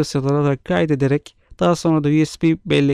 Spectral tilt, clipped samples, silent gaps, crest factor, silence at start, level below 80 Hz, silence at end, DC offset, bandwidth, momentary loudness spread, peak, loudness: -7 dB/octave; under 0.1%; none; 12 dB; 0 s; -48 dBFS; 0 s; under 0.1%; 12 kHz; 3 LU; -6 dBFS; -18 LUFS